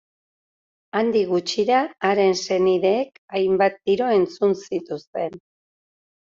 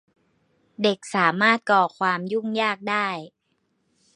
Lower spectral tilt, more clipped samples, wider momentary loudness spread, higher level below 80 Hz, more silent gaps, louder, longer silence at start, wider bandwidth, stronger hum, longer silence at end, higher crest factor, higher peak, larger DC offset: about the same, -5 dB/octave vs -4.5 dB/octave; neither; about the same, 10 LU vs 8 LU; first, -66 dBFS vs -74 dBFS; first, 3.18-3.28 s, 5.07-5.13 s vs none; about the same, -21 LUFS vs -22 LUFS; first, 0.95 s vs 0.8 s; second, 7.6 kHz vs 11 kHz; neither; about the same, 0.85 s vs 0.85 s; second, 16 dB vs 22 dB; about the same, -6 dBFS vs -4 dBFS; neither